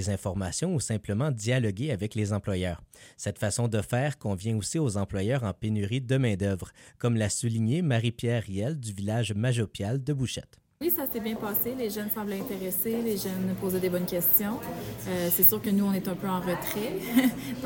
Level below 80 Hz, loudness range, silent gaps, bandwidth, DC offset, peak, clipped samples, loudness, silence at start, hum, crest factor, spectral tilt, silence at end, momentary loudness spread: -56 dBFS; 5 LU; none; 17 kHz; under 0.1%; -4 dBFS; under 0.1%; -28 LUFS; 0 s; none; 24 dB; -5.5 dB/octave; 0 s; 8 LU